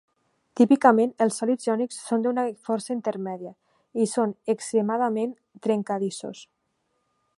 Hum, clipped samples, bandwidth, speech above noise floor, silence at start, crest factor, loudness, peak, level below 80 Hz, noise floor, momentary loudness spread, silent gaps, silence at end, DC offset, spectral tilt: none; under 0.1%; 11.5 kHz; 50 dB; 0.55 s; 22 dB; -25 LUFS; -2 dBFS; -78 dBFS; -74 dBFS; 16 LU; none; 0.95 s; under 0.1%; -5.5 dB/octave